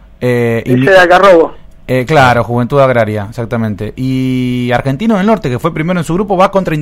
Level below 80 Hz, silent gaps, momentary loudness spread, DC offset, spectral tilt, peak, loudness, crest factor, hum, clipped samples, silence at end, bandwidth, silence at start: -34 dBFS; none; 11 LU; under 0.1%; -7 dB/octave; 0 dBFS; -10 LUFS; 10 dB; none; 1%; 0 s; 16 kHz; 0.2 s